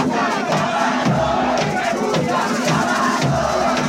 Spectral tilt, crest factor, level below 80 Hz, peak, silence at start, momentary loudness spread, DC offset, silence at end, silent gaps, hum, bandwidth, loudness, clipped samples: -5 dB/octave; 12 dB; -44 dBFS; -6 dBFS; 0 s; 2 LU; under 0.1%; 0 s; none; none; 16 kHz; -18 LUFS; under 0.1%